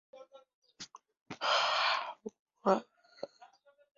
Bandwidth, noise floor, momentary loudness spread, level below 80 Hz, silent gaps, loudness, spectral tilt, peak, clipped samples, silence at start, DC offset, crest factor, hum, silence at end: 7.4 kHz; -62 dBFS; 21 LU; -84 dBFS; 0.54-0.62 s, 1.22-1.26 s, 2.39-2.46 s; -32 LUFS; -0.5 dB/octave; -14 dBFS; under 0.1%; 0.15 s; under 0.1%; 22 dB; none; 0.5 s